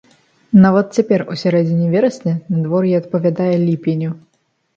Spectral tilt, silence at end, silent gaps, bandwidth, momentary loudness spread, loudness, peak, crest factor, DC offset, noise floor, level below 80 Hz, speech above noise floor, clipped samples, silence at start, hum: -8.5 dB/octave; 0.6 s; none; 7.6 kHz; 9 LU; -16 LUFS; 0 dBFS; 16 dB; under 0.1%; -64 dBFS; -56 dBFS; 50 dB; under 0.1%; 0.5 s; none